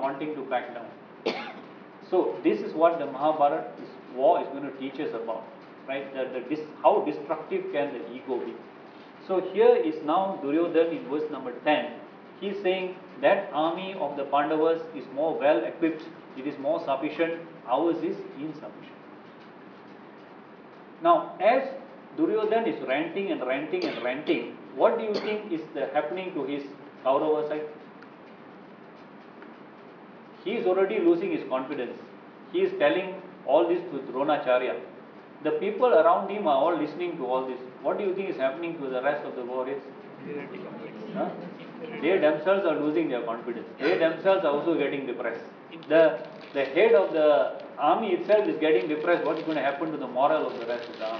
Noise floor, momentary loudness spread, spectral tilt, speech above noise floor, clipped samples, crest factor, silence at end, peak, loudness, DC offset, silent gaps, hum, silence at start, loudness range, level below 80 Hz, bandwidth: -48 dBFS; 22 LU; -7.5 dB/octave; 21 dB; under 0.1%; 20 dB; 0 s; -8 dBFS; -27 LUFS; under 0.1%; none; none; 0 s; 7 LU; -88 dBFS; 5.4 kHz